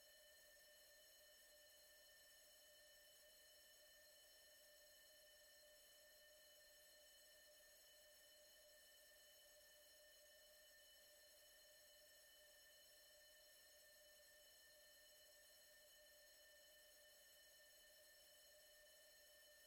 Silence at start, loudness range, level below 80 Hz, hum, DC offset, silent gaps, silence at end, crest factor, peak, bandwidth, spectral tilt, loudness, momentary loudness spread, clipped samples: 0 s; 0 LU; under -90 dBFS; none; under 0.1%; none; 0 s; 10 dB; -60 dBFS; 16.5 kHz; 1 dB/octave; -67 LUFS; 0 LU; under 0.1%